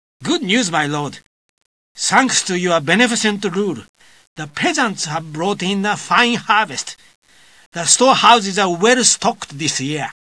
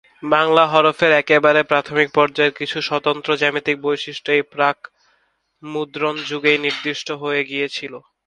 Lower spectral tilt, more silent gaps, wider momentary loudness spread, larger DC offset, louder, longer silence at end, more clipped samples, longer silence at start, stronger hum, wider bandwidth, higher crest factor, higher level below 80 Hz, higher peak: second, -2.5 dB/octave vs -4.5 dB/octave; first, 1.26-1.58 s, 1.66-1.95 s, 3.89-3.94 s, 4.27-4.36 s, 7.15-7.22 s, 7.66-7.72 s vs none; about the same, 12 LU vs 11 LU; first, 0.2% vs under 0.1%; about the same, -16 LUFS vs -18 LUFS; second, 0.1 s vs 0.25 s; neither; about the same, 0.2 s vs 0.2 s; neither; about the same, 11 kHz vs 10 kHz; about the same, 18 dB vs 18 dB; about the same, -64 dBFS vs -64 dBFS; about the same, 0 dBFS vs 0 dBFS